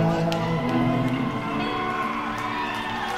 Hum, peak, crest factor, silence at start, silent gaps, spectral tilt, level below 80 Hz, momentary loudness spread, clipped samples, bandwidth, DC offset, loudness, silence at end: none; -8 dBFS; 16 dB; 0 s; none; -6.5 dB/octave; -46 dBFS; 5 LU; under 0.1%; 15.5 kHz; under 0.1%; -25 LUFS; 0 s